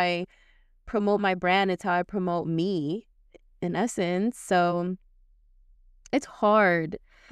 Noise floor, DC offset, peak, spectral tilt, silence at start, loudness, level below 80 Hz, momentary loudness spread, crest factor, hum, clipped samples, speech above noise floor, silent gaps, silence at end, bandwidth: -59 dBFS; under 0.1%; -10 dBFS; -5.5 dB/octave; 0 s; -26 LUFS; -58 dBFS; 12 LU; 16 dB; none; under 0.1%; 34 dB; none; 0.35 s; 13 kHz